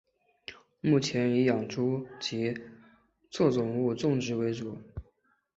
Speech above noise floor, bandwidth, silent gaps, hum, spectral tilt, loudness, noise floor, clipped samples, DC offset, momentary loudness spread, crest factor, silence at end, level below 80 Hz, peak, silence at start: 41 dB; 8 kHz; none; none; -6 dB/octave; -29 LUFS; -69 dBFS; under 0.1%; under 0.1%; 20 LU; 18 dB; 0.55 s; -58 dBFS; -12 dBFS; 0.5 s